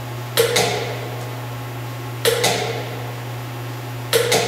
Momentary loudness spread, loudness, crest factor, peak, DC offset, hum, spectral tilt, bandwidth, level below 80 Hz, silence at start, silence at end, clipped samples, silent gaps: 12 LU; -22 LUFS; 20 dB; -2 dBFS; under 0.1%; none; -3 dB/octave; 16 kHz; -54 dBFS; 0 s; 0 s; under 0.1%; none